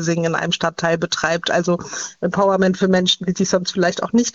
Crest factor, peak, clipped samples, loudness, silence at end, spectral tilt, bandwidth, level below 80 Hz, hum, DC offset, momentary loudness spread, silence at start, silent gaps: 16 dB; -2 dBFS; under 0.1%; -18 LUFS; 0.05 s; -4.5 dB/octave; 7.8 kHz; -54 dBFS; none; under 0.1%; 6 LU; 0 s; none